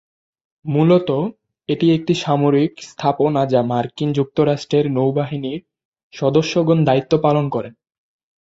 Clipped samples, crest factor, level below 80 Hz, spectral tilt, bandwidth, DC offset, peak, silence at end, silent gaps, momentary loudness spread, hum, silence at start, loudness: under 0.1%; 16 dB; -58 dBFS; -7.5 dB/octave; 7.8 kHz; under 0.1%; -2 dBFS; 0.75 s; 5.85-5.92 s, 6.03-6.10 s; 11 LU; none; 0.65 s; -18 LUFS